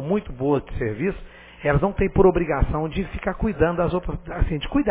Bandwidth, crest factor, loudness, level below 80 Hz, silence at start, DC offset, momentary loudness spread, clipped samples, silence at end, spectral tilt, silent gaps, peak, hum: 4 kHz; 18 dB; -23 LUFS; -30 dBFS; 0 s; under 0.1%; 10 LU; under 0.1%; 0 s; -11.5 dB/octave; none; -4 dBFS; none